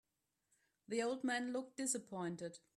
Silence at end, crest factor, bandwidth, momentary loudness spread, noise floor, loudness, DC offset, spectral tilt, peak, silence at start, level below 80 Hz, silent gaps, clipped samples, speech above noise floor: 0.2 s; 18 dB; 14 kHz; 6 LU; -85 dBFS; -42 LUFS; under 0.1%; -3.5 dB/octave; -26 dBFS; 0.9 s; -86 dBFS; none; under 0.1%; 43 dB